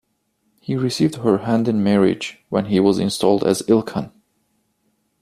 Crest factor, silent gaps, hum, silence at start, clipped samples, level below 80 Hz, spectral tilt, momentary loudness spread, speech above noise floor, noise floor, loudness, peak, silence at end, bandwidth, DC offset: 18 dB; none; none; 0.7 s; under 0.1%; -56 dBFS; -6 dB/octave; 10 LU; 50 dB; -68 dBFS; -19 LUFS; -2 dBFS; 1.15 s; 14.5 kHz; under 0.1%